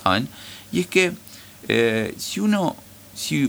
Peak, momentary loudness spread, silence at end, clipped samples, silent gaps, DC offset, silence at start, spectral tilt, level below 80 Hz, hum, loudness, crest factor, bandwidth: -2 dBFS; 19 LU; 0 s; under 0.1%; none; under 0.1%; 0 s; -4.5 dB/octave; -58 dBFS; none; -22 LUFS; 20 dB; over 20 kHz